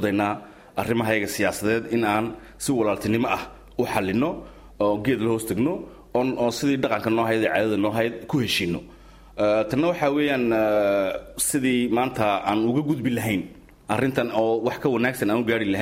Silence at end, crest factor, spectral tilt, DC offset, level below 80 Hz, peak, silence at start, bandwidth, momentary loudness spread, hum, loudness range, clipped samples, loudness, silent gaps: 0 s; 16 dB; -5 dB/octave; under 0.1%; -52 dBFS; -8 dBFS; 0 s; 16 kHz; 7 LU; none; 3 LU; under 0.1%; -23 LUFS; none